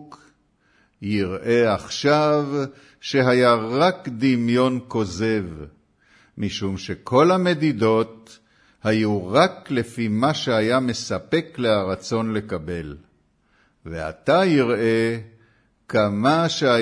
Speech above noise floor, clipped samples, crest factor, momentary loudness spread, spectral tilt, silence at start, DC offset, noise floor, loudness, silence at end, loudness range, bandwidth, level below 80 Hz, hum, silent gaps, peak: 42 dB; under 0.1%; 20 dB; 13 LU; -6 dB/octave; 0 s; under 0.1%; -62 dBFS; -21 LUFS; 0 s; 4 LU; 11 kHz; -54 dBFS; none; none; -2 dBFS